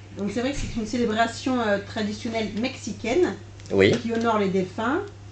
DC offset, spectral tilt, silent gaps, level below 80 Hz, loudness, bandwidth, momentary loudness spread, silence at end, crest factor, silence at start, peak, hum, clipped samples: under 0.1%; -5.5 dB/octave; none; -44 dBFS; -25 LUFS; 9 kHz; 9 LU; 0 s; 22 dB; 0 s; -2 dBFS; none; under 0.1%